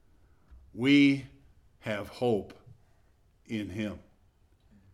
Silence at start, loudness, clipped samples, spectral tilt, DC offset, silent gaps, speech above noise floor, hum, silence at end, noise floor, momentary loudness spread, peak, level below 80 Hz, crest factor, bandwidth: 0.5 s; -29 LUFS; under 0.1%; -6.5 dB/octave; under 0.1%; none; 37 dB; none; 0.95 s; -64 dBFS; 26 LU; -12 dBFS; -62 dBFS; 20 dB; 11.5 kHz